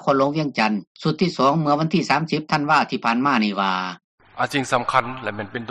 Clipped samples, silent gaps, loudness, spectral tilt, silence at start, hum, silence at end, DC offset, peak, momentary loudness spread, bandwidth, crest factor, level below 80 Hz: under 0.1%; 0.87-0.95 s, 4.04-4.18 s; -21 LUFS; -5.5 dB/octave; 0 s; none; 0 s; under 0.1%; -2 dBFS; 8 LU; 11 kHz; 18 dB; -60 dBFS